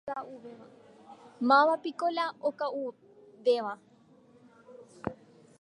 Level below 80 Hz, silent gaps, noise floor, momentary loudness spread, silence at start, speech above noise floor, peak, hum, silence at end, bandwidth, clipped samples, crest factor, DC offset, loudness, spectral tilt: -72 dBFS; none; -60 dBFS; 21 LU; 0.05 s; 31 dB; -12 dBFS; none; 0.45 s; 11 kHz; under 0.1%; 20 dB; under 0.1%; -30 LUFS; -5.5 dB/octave